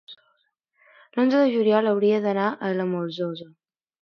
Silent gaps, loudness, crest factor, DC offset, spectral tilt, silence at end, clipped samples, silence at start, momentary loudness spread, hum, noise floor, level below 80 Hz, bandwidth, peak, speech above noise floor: none; -23 LUFS; 16 dB; under 0.1%; -8 dB/octave; 0.6 s; under 0.1%; 0.1 s; 11 LU; none; -70 dBFS; -78 dBFS; 6.4 kHz; -8 dBFS; 48 dB